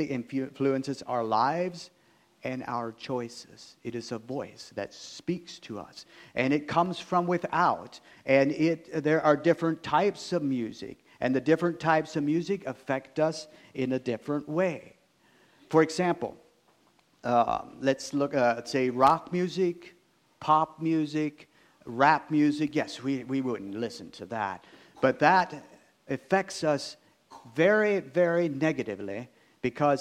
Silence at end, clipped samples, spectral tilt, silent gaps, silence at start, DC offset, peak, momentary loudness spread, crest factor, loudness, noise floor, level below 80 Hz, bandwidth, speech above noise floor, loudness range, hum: 0 s; under 0.1%; -6 dB/octave; none; 0 s; under 0.1%; -6 dBFS; 16 LU; 22 dB; -28 LUFS; -65 dBFS; -68 dBFS; 13 kHz; 38 dB; 6 LU; none